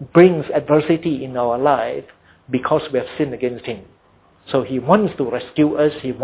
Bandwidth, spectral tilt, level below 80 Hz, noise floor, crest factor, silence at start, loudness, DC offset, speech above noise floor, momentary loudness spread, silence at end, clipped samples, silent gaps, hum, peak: 4 kHz; -11 dB/octave; -52 dBFS; -54 dBFS; 18 dB; 0 s; -18 LUFS; under 0.1%; 36 dB; 10 LU; 0 s; under 0.1%; none; none; 0 dBFS